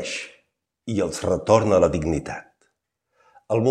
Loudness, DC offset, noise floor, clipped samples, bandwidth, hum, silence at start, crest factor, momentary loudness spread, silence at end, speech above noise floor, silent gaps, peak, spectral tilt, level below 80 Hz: -22 LUFS; under 0.1%; -75 dBFS; under 0.1%; 12.5 kHz; none; 0 s; 22 dB; 19 LU; 0 s; 53 dB; none; -2 dBFS; -6 dB/octave; -46 dBFS